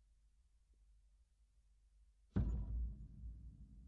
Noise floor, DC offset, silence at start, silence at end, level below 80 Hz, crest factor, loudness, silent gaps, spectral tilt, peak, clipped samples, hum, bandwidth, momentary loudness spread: -73 dBFS; under 0.1%; 0.9 s; 0 s; -50 dBFS; 22 dB; -46 LUFS; none; -10 dB/octave; -26 dBFS; under 0.1%; none; 3.5 kHz; 16 LU